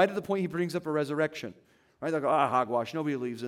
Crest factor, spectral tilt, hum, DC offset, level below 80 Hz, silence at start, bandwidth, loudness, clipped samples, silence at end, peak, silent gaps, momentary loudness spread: 18 dB; -6.5 dB/octave; none; under 0.1%; -74 dBFS; 0 s; 16 kHz; -30 LUFS; under 0.1%; 0 s; -12 dBFS; none; 8 LU